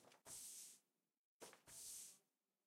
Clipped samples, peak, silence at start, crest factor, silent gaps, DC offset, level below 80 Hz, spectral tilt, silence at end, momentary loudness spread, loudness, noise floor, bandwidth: under 0.1%; -42 dBFS; 0 s; 20 dB; 1.17-1.40 s; under 0.1%; under -90 dBFS; 0 dB/octave; 0.45 s; 10 LU; -57 LUFS; -86 dBFS; 16 kHz